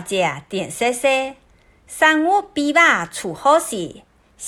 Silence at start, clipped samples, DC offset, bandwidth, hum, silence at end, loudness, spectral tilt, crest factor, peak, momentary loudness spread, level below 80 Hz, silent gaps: 0 s; under 0.1%; under 0.1%; 17.5 kHz; none; 0 s; -18 LUFS; -3 dB/octave; 18 dB; -2 dBFS; 14 LU; -56 dBFS; none